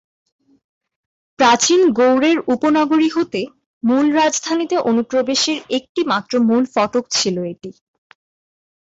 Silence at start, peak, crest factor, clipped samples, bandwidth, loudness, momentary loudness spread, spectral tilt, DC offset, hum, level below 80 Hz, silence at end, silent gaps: 1.4 s; -4 dBFS; 14 dB; under 0.1%; 8 kHz; -16 LUFS; 10 LU; -3 dB/octave; under 0.1%; none; -60 dBFS; 1.2 s; 3.66-3.81 s, 5.89-5.95 s